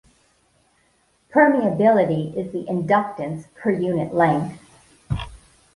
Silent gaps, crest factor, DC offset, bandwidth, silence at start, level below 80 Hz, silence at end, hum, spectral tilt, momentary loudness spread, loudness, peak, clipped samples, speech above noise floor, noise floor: none; 18 dB; under 0.1%; 11.5 kHz; 1.35 s; -46 dBFS; 0.4 s; none; -8 dB/octave; 13 LU; -21 LUFS; -2 dBFS; under 0.1%; 43 dB; -63 dBFS